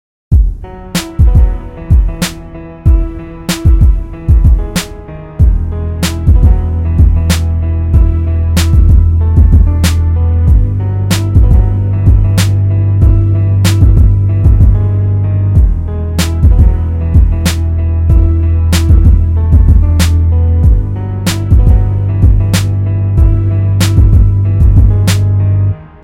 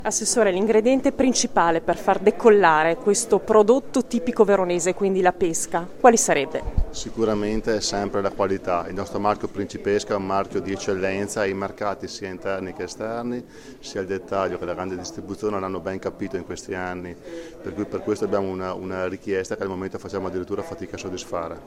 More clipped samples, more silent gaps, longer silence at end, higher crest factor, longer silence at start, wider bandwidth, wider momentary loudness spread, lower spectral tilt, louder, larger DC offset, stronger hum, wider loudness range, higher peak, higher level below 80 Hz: first, 2% vs under 0.1%; neither; first, 0.15 s vs 0 s; second, 8 dB vs 22 dB; first, 0.3 s vs 0 s; about the same, 16 kHz vs 16 kHz; second, 8 LU vs 14 LU; first, -6.5 dB/octave vs -4 dB/octave; first, -10 LUFS vs -23 LUFS; neither; neither; second, 3 LU vs 10 LU; about the same, 0 dBFS vs -2 dBFS; first, -10 dBFS vs -40 dBFS